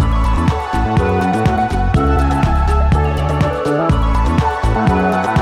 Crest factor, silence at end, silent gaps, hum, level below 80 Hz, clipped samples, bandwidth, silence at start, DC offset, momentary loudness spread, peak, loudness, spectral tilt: 10 dB; 0 s; none; none; -18 dBFS; under 0.1%; 11.5 kHz; 0 s; under 0.1%; 2 LU; -4 dBFS; -15 LUFS; -7.5 dB/octave